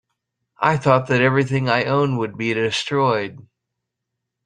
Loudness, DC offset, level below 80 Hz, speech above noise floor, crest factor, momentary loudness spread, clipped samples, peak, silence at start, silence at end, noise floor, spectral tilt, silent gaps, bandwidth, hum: -19 LUFS; under 0.1%; -58 dBFS; 62 dB; 18 dB; 6 LU; under 0.1%; -2 dBFS; 0.6 s; 1.1 s; -80 dBFS; -6 dB/octave; none; 9.8 kHz; 60 Hz at -45 dBFS